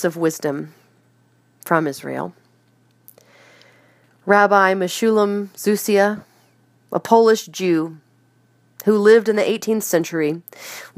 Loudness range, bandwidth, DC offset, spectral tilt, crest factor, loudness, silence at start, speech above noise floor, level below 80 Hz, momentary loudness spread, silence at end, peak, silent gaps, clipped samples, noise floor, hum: 10 LU; 15.5 kHz; under 0.1%; -4.5 dB/octave; 20 dB; -18 LUFS; 0 s; 41 dB; -72 dBFS; 17 LU; 0.1 s; 0 dBFS; none; under 0.1%; -58 dBFS; none